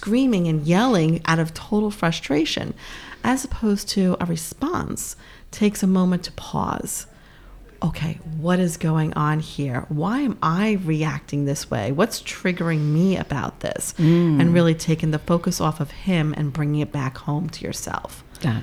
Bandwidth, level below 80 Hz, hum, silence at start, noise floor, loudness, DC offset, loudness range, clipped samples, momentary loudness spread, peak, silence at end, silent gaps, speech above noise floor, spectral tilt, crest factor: 15.5 kHz; -44 dBFS; none; 0 s; -45 dBFS; -22 LUFS; under 0.1%; 4 LU; under 0.1%; 10 LU; -4 dBFS; 0 s; none; 23 dB; -6 dB/octave; 18 dB